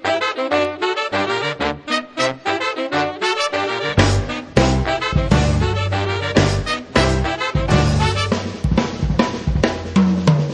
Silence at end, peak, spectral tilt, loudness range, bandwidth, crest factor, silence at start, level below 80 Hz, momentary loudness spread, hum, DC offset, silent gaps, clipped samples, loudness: 0 s; 0 dBFS; -5.5 dB/octave; 2 LU; 10.5 kHz; 18 dB; 0 s; -28 dBFS; 5 LU; none; under 0.1%; none; under 0.1%; -18 LUFS